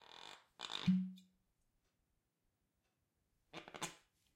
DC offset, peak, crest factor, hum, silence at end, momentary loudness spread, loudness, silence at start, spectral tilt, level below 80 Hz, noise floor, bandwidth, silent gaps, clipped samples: under 0.1%; -26 dBFS; 22 dB; none; 0.4 s; 19 LU; -42 LUFS; 0.1 s; -5 dB/octave; -80 dBFS; -85 dBFS; 15 kHz; none; under 0.1%